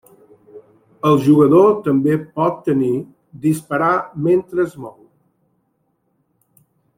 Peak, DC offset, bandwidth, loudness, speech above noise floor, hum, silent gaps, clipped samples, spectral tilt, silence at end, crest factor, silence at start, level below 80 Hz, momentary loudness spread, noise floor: -2 dBFS; under 0.1%; 16 kHz; -16 LUFS; 51 dB; none; none; under 0.1%; -8 dB/octave; 2.05 s; 16 dB; 0.55 s; -58 dBFS; 12 LU; -67 dBFS